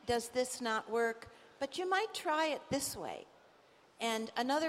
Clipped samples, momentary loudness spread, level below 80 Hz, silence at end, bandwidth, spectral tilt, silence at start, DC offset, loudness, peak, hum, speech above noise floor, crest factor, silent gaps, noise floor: under 0.1%; 10 LU; -68 dBFS; 0 s; 16 kHz; -2.5 dB/octave; 0.05 s; under 0.1%; -36 LUFS; -20 dBFS; none; 29 dB; 16 dB; none; -65 dBFS